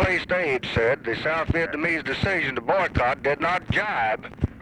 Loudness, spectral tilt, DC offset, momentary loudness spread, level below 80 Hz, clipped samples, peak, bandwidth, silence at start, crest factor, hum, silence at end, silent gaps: -24 LUFS; -6 dB/octave; under 0.1%; 2 LU; -40 dBFS; under 0.1%; -8 dBFS; 11.5 kHz; 0 s; 16 dB; none; 0 s; none